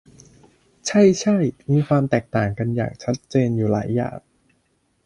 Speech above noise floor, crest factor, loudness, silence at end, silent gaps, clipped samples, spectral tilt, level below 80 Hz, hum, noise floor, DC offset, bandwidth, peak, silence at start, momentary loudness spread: 47 dB; 18 dB; -21 LUFS; 0.9 s; none; under 0.1%; -6.5 dB/octave; -52 dBFS; none; -66 dBFS; under 0.1%; 11 kHz; -2 dBFS; 0.85 s; 10 LU